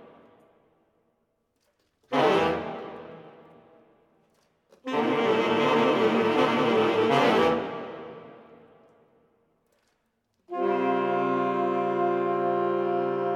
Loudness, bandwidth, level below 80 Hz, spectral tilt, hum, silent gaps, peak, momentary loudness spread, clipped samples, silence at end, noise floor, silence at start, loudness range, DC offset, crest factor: -25 LUFS; 12.5 kHz; -68 dBFS; -6 dB/octave; none; none; -10 dBFS; 17 LU; under 0.1%; 0 s; -74 dBFS; 2.1 s; 8 LU; under 0.1%; 18 dB